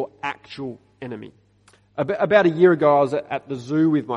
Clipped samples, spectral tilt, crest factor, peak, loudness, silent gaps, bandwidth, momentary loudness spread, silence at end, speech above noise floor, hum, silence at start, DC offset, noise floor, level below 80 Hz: under 0.1%; -7.5 dB/octave; 20 dB; -2 dBFS; -19 LUFS; none; 8.2 kHz; 20 LU; 0 s; 37 dB; none; 0 s; under 0.1%; -57 dBFS; -64 dBFS